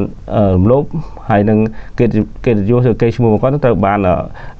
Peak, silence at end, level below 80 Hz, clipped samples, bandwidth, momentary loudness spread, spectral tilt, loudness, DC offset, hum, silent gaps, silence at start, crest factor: -2 dBFS; 0 s; -30 dBFS; under 0.1%; 6.6 kHz; 6 LU; -10 dB/octave; -13 LUFS; under 0.1%; none; none; 0 s; 12 dB